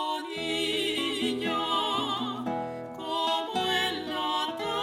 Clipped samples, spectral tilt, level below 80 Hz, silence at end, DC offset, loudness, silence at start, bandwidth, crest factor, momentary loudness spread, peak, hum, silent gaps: under 0.1%; -3 dB/octave; -66 dBFS; 0 s; under 0.1%; -29 LUFS; 0 s; 16 kHz; 16 dB; 6 LU; -14 dBFS; none; none